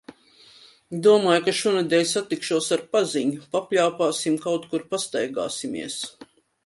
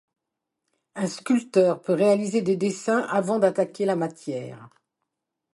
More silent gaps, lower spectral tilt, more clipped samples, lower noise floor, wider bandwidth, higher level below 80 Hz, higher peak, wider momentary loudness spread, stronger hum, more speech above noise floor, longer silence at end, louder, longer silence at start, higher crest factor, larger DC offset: neither; second, -3.5 dB/octave vs -6 dB/octave; neither; second, -53 dBFS vs -84 dBFS; about the same, 11.5 kHz vs 11.5 kHz; about the same, -70 dBFS vs -74 dBFS; about the same, -6 dBFS vs -6 dBFS; about the same, 11 LU vs 12 LU; neither; second, 30 dB vs 60 dB; second, 0.4 s vs 0.85 s; about the same, -23 LUFS vs -24 LUFS; second, 0.1 s vs 0.95 s; about the same, 18 dB vs 18 dB; neither